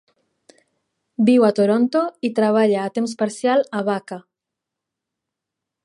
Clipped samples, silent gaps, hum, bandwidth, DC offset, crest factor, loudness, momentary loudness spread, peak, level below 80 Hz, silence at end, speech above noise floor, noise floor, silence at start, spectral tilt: under 0.1%; none; none; 11.5 kHz; under 0.1%; 18 dB; -19 LUFS; 11 LU; -4 dBFS; -76 dBFS; 1.65 s; 66 dB; -84 dBFS; 1.2 s; -6 dB/octave